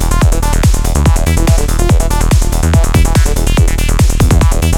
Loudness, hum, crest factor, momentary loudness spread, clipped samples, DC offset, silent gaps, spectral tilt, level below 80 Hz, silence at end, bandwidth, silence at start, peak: -12 LUFS; none; 8 dB; 2 LU; under 0.1%; under 0.1%; none; -5.5 dB/octave; -10 dBFS; 0 s; 17 kHz; 0 s; 0 dBFS